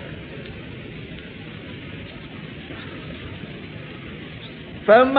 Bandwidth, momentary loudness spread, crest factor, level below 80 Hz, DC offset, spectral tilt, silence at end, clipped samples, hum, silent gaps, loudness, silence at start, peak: 4.8 kHz; 7 LU; 22 dB; -48 dBFS; under 0.1%; -9.5 dB/octave; 0 s; under 0.1%; none; none; -28 LUFS; 0 s; -2 dBFS